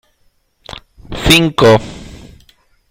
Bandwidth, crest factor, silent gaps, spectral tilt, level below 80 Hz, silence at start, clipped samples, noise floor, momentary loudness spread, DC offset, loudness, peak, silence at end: 19.5 kHz; 16 dB; none; -4.5 dB/octave; -32 dBFS; 0.7 s; under 0.1%; -57 dBFS; 24 LU; under 0.1%; -10 LUFS; 0 dBFS; 0.8 s